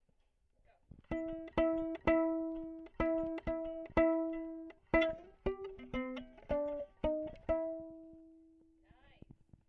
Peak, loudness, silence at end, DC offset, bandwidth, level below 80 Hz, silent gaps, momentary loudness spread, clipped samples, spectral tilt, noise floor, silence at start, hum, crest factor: -18 dBFS; -37 LUFS; 1.3 s; under 0.1%; 6.2 kHz; -54 dBFS; none; 14 LU; under 0.1%; -8 dB/octave; -74 dBFS; 1.1 s; none; 22 dB